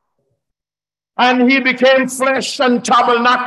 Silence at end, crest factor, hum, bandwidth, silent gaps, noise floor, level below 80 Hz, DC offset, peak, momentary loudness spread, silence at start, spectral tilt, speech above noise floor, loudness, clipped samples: 0 s; 12 dB; none; 12.5 kHz; none; under -90 dBFS; -64 dBFS; under 0.1%; -2 dBFS; 5 LU; 1.2 s; -3 dB/octave; over 77 dB; -13 LUFS; under 0.1%